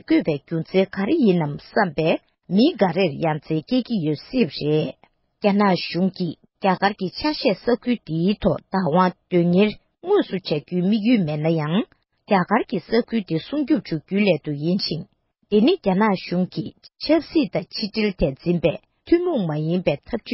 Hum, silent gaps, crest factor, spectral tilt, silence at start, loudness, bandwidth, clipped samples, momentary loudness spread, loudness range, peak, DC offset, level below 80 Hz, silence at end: none; none; 16 dB; -11 dB/octave; 0.1 s; -22 LUFS; 5.8 kHz; under 0.1%; 7 LU; 2 LU; -4 dBFS; under 0.1%; -50 dBFS; 0 s